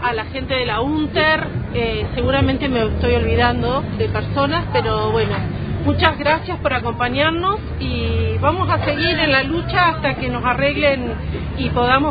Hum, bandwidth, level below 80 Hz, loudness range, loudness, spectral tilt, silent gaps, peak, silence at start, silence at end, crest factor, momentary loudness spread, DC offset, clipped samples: none; 5 kHz; -32 dBFS; 1 LU; -18 LUFS; -9.5 dB/octave; none; 0 dBFS; 0 s; 0 s; 18 dB; 6 LU; under 0.1%; under 0.1%